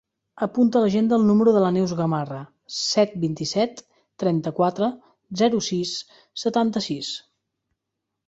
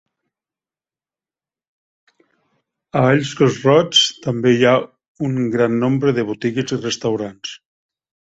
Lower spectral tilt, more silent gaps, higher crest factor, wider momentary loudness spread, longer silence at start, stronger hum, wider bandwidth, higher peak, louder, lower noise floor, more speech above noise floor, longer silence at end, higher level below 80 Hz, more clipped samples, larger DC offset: about the same, -5.5 dB/octave vs -5 dB/octave; second, none vs 5.08-5.15 s; about the same, 16 dB vs 18 dB; first, 14 LU vs 11 LU; second, 0.35 s vs 2.95 s; neither; about the same, 8 kHz vs 8.2 kHz; second, -6 dBFS vs -2 dBFS; second, -22 LUFS vs -17 LUFS; second, -82 dBFS vs under -90 dBFS; second, 60 dB vs over 73 dB; first, 1.1 s vs 0.8 s; about the same, -62 dBFS vs -58 dBFS; neither; neither